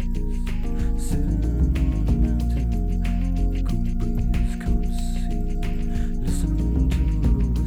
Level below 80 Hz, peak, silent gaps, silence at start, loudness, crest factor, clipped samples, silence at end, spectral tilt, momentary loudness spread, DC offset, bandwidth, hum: -22 dBFS; -8 dBFS; none; 0 s; -25 LUFS; 12 dB; under 0.1%; 0 s; -7.5 dB/octave; 6 LU; under 0.1%; 12.5 kHz; none